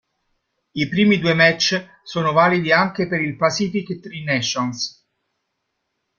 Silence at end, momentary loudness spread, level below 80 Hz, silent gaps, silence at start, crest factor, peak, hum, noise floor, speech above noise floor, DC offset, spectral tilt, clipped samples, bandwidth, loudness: 1.3 s; 13 LU; -58 dBFS; none; 0.75 s; 20 dB; 0 dBFS; none; -75 dBFS; 56 dB; under 0.1%; -4.5 dB/octave; under 0.1%; 7.2 kHz; -19 LUFS